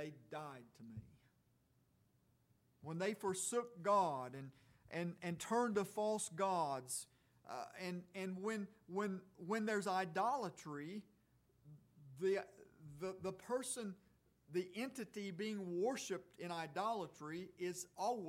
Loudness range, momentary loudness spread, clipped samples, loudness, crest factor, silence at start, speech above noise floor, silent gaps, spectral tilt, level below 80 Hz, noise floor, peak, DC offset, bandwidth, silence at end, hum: 6 LU; 15 LU; under 0.1%; -43 LUFS; 18 dB; 0 s; 34 dB; none; -4.5 dB/octave; -82 dBFS; -77 dBFS; -26 dBFS; under 0.1%; 16.5 kHz; 0 s; none